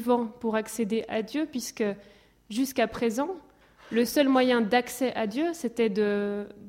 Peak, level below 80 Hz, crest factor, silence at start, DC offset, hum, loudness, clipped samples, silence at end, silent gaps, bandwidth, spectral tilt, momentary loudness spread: -10 dBFS; -64 dBFS; 18 dB; 0 s; under 0.1%; none; -27 LUFS; under 0.1%; 0 s; none; 16.5 kHz; -4.5 dB/octave; 9 LU